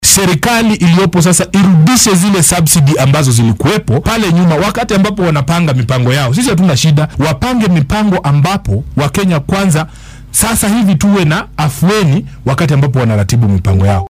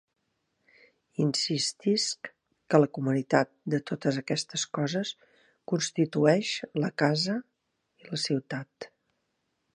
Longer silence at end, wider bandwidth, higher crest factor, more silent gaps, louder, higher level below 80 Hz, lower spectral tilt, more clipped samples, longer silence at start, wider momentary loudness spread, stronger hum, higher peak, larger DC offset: second, 0 s vs 0.9 s; first, 16.5 kHz vs 11.5 kHz; second, 10 dB vs 24 dB; neither; first, -10 LUFS vs -28 LUFS; first, -30 dBFS vs -76 dBFS; about the same, -5 dB/octave vs -4.5 dB/octave; neither; second, 0 s vs 1.2 s; second, 6 LU vs 14 LU; neither; first, 0 dBFS vs -6 dBFS; neither